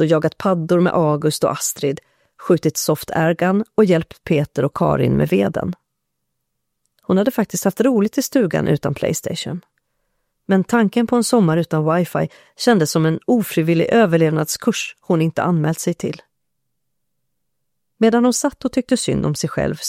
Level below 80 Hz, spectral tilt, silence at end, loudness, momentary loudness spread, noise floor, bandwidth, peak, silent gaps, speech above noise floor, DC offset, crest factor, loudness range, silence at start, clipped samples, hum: -50 dBFS; -5.5 dB/octave; 0 s; -18 LUFS; 8 LU; -78 dBFS; 16.5 kHz; 0 dBFS; none; 60 dB; under 0.1%; 18 dB; 4 LU; 0 s; under 0.1%; none